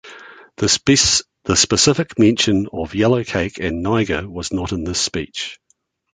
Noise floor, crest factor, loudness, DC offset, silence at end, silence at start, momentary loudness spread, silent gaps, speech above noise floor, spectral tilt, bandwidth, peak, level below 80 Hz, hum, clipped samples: -64 dBFS; 18 dB; -17 LUFS; under 0.1%; 0.6 s; 0.05 s; 11 LU; none; 46 dB; -3.5 dB/octave; 9.6 kHz; 0 dBFS; -40 dBFS; none; under 0.1%